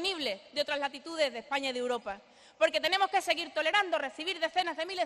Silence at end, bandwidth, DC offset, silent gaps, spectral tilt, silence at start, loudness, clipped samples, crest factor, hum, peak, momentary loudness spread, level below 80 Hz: 0 s; 13 kHz; under 0.1%; none; -1 dB/octave; 0 s; -31 LUFS; under 0.1%; 18 dB; none; -14 dBFS; 7 LU; -74 dBFS